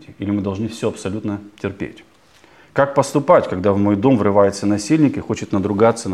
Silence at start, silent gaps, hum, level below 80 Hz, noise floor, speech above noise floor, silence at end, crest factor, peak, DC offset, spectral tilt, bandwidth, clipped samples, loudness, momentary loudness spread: 0.1 s; none; none; -54 dBFS; -50 dBFS; 32 dB; 0 s; 18 dB; 0 dBFS; 0.1%; -6.5 dB/octave; 13 kHz; under 0.1%; -18 LUFS; 12 LU